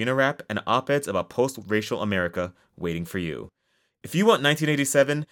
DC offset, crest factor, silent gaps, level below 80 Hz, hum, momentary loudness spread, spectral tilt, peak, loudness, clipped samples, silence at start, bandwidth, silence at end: under 0.1%; 20 dB; none; -62 dBFS; none; 11 LU; -4.5 dB/octave; -6 dBFS; -24 LUFS; under 0.1%; 0 s; 18 kHz; 0.1 s